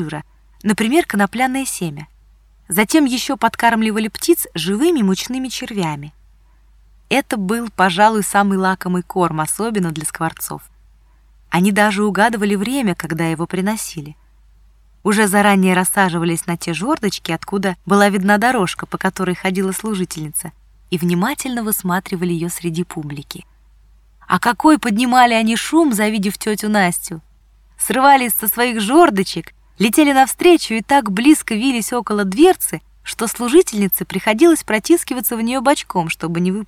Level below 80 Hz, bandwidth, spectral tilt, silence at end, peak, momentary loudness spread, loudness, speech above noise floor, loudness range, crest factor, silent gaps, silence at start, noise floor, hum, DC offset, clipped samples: -48 dBFS; 18 kHz; -4.5 dB/octave; 0 s; 0 dBFS; 11 LU; -16 LUFS; 34 dB; 6 LU; 16 dB; none; 0 s; -50 dBFS; none; under 0.1%; under 0.1%